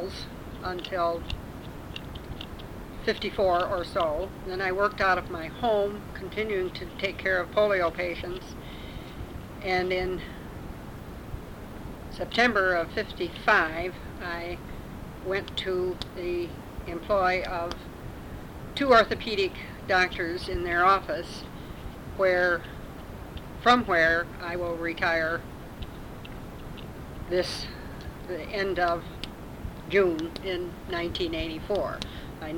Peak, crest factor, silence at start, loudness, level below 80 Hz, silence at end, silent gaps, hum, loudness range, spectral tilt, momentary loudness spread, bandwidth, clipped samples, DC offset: -6 dBFS; 24 dB; 0 s; -27 LUFS; -44 dBFS; 0 s; none; none; 7 LU; -5 dB/octave; 18 LU; 18.5 kHz; under 0.1%; under 0.1%